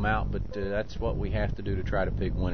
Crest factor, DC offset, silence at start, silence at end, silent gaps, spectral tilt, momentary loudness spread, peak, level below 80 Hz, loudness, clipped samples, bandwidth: 16 dB; 1%; 0 s; 0 s; none; -8 dB/octave; 4 LU; -12 dBFS; -34 dBFS; -31 LUFS; under 0.1%; 6.4 kHz